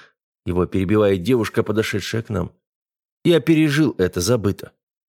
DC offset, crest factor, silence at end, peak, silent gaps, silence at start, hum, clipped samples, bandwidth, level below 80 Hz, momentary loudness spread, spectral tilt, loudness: under 0.1%; 16 dB; 0.45 s; -4 dBFS; 2.67-2.86 s, 3.12-3.21 s; 0.45 s; none; under 0.1%; 17.5 kHz; -48 dBFS; 11 LU; -6 dB/octave; -19 LUFS